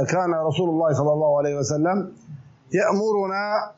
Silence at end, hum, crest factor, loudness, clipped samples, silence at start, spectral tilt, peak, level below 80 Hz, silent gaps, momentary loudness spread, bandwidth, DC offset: 0.05 s; none; 12 dB; -22 LUFS; under 0.1%; 0 s; -6 dB/octave; -10 dBFS; -66 dBFS; none; 4 LU; 8 kHz; under 0.1%